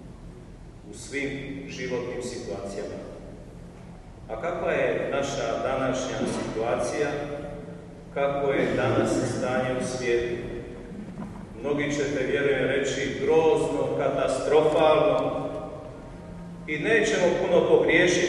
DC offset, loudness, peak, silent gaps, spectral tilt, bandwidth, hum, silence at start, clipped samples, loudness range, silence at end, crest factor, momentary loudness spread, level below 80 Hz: under 0.1%; -25 LUFS; -8 dBFS; none; -5 dB/octave; 11.5 kHz; none; 0 s; under 0.1%; 11 LU; 0 s; 18 dB; 21 LU; -48 dBFS